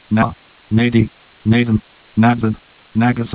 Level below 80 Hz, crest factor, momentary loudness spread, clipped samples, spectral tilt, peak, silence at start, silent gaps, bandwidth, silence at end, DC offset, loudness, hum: -40 dBFS; 16 dB; 9 LU; under 0.1%; -11.5 dB/octave; 0 dBFS; 0.1 s; none; 4 kHz; 0 s; under 0.1%; -17 LUFS; none